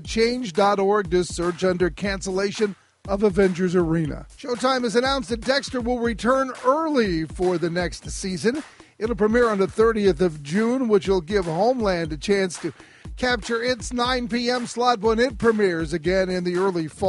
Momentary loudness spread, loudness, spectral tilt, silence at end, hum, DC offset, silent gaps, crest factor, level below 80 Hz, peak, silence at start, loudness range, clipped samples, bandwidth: 7 LU; -22 LUFS; -5 dB/octave; 0 s; none; under 0.1%; none; 18 dB; -40 dBFS; -4 dBFS; 0 s; 2 LU; under 0.1%; 11.5 kHz